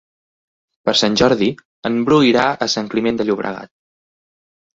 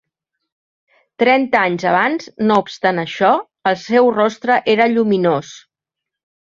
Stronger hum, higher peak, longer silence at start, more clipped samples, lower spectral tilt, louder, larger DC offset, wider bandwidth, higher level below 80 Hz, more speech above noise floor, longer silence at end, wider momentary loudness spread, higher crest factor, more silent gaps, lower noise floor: neither; about the same, -2 dBFS vs 0 dBFS; second, 0.85 s vs 1.2 s; neither; about the same, -4.5 dB/octave vs -5.5 dB/octave; about the same, -17 LUFS vs -16 LUFS; neither; about the same, 8 kHz vs 7.4 kHz; first, -52 dBFS vs -62 dBFS; first, over 74 dB vs 68 dB; first, 1.1 s vs 0.9 s; first, 11 LU vs 5 LU; about the same, 18 dB vs 16 dB; first, 1.65-1.83 s vs none; first, under -90 dBFS vs -83 dBFS